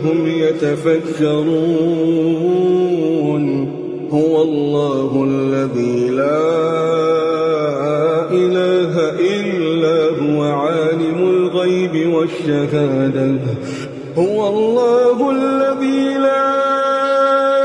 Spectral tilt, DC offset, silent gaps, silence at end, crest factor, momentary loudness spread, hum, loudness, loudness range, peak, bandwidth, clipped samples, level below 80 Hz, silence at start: -7 dB/octave; under 0.1%; none; 0 s; 12 dB; 3 LU; none; -16 LUFS; 2 LU; -4 dBFS; 10.5 kHz; under 0.1%; -60 dBFS; 0 s